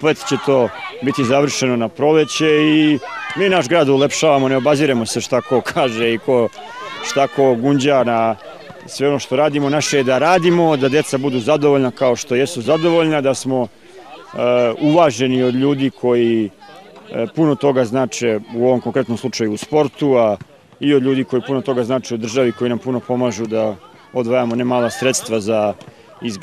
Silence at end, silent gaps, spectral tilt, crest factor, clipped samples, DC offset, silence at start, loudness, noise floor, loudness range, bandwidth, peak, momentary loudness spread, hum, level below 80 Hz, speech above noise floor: 0 s; none; -5 dB/octave; 14 dB; under 0.1%; 0.2%; 0 s; -16 LUFS; -40 dBFS; 4 LU; 14.5 kHz; -2 dBFS; 8 LU; none; -62 dBFS; 24 dB